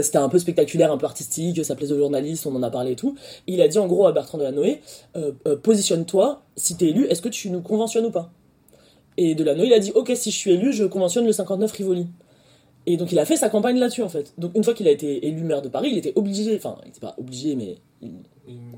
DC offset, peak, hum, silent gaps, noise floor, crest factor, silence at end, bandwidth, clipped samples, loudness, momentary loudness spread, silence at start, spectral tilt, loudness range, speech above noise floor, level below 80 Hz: under 0.1%; -4 dBFS; none; none; -55 dBFS; 18 dB; 0 s; 16.5 kHz; under 0.1%; -21 LUFS; 13 LU; 0 s; -5 dB/octave; 3 LU; 34 dB; -66 dBFS